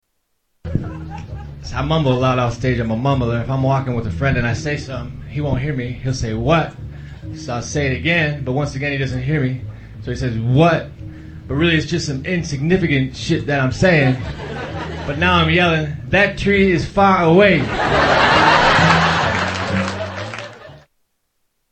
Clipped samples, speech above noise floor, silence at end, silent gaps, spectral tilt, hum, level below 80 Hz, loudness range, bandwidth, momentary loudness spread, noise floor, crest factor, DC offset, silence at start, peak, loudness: under 0.1%; 52 dB; 0.9 s; none; -6 dB/octave; none; -34 dBFS; 7 LU; 8.8 kHz; 17 LU; -68 dBFS; 18 dB; under 0.1%; 0.65 s; 0 dBFS; -17 LUFS